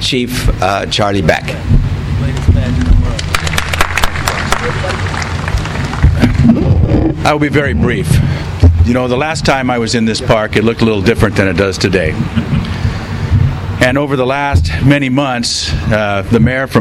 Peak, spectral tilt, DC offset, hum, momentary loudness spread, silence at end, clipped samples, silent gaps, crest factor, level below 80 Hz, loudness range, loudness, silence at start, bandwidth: 0 dBFS; -5.5 dB/octave; under 0.1%; none; 6 LU; 0 s; 0.3%; none; 12 dB; -20 dBFS; 3 LU; -13 LUFS; 0 s; 16 kHz